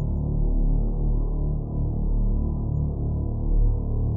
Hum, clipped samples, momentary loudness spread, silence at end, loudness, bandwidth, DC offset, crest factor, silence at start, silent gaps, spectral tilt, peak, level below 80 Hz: none; under 0.1%; 2 LU; 0 s; -27 LUFS; 1.3 kHz; under 0.1%; 10 dB; 0 s; none; -16 dB/octave; -12 dBFS; -24 dBFS